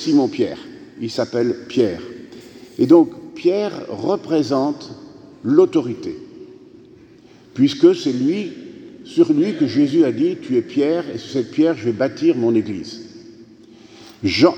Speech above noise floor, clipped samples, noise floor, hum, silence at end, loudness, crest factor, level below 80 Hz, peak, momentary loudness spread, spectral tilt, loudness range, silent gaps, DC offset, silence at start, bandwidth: 29 dB; under 0.1%; -46 dBFS; none; 0 s; -18 LUFS; 18 dB; -60 dBFS; 0 dBFS; 21 LU; -6.5 dB/octave; 3 LU; none; under 0.1%; 0 s; 8.4 kHz